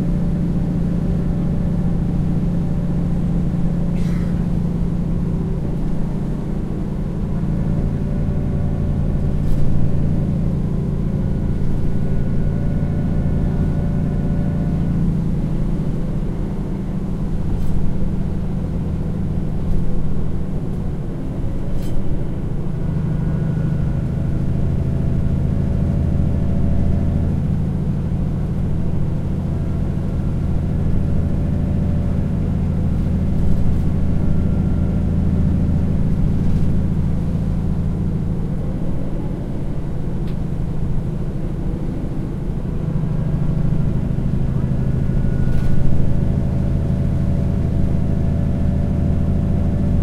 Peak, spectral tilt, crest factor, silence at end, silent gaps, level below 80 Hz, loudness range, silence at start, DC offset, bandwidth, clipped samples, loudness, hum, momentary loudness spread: 0 dBFS; -10 dB/octave; 16 dB; 0 s; none; -24 dBFS; 4 LU; 0 s; under 0.1%; 5.4 kHz; under 0.1%; -21 LUFS; none; 5 LU